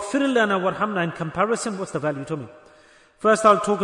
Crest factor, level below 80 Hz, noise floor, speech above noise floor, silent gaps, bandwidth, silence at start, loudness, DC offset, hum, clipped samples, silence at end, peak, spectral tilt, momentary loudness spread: 18 dB; -60 dBFS; -53 dBFS; 32 dB; none; 11 kHz; 0 s; -22 LUFS; under 0.1%; none; under 0.1%; 0 s; -4 dBFS; -5 dB/octave; 13 LU